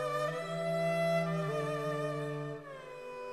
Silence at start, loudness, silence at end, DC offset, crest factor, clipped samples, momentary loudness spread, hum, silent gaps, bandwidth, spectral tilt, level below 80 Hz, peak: 0 s; -35 LUFS; 0 s; under 0.1%; 14 dB; under 0.1%; 14 LU; none; none; 14 kHz; -6 dB/octave; -74 dBFS; -20 dBFS